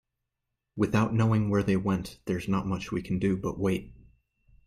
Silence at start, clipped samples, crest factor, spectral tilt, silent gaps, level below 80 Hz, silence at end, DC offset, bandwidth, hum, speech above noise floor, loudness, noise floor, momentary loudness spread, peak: 0.75 s; under 0.1%; 16 dB; -7.5 dB/octave; none; -52 dBFS; 0.75 s; under 0.1%; 14.5 kHz; none; 57 dB; -28 LUFS; -84 dBFS; 8 LU; -12 dBFS